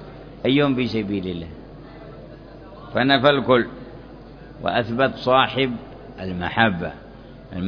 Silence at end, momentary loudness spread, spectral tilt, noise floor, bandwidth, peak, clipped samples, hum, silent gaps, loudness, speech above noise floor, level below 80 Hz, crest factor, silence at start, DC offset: 0 s; 24 LU; -7.5 dB/octave; -41 dBFS; 5.4 kHz; -2 dBFS; under 0.1%; none; none; -21 LUFS; 21 dB; -46 dBFS; 22 dB; 0 s; under 0.1%